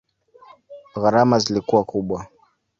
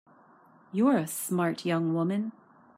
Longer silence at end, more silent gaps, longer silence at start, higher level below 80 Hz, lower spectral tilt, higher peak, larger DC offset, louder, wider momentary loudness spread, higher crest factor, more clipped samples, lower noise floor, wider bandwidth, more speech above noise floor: about the same, 0.55 s vs 0.45 s; neither; about the same, 0.7 s vs 0.75 s; first, -54 dBFS vs -78 dBFS; about the same, -5.5 dB/octave vs -6 dB/octave; first, -2 dBFS vs -12 dBFS; neither; first, -20 LUFS vs -29 LUFS; first, 13 LU vs 9 LU; about the same, 20 dB vs 16 dB; neither; second, -50 dBFS vs -58 dBFS; second, 7.8 kHz vs 16 kHz; about the same, 31 dB vs 31 dB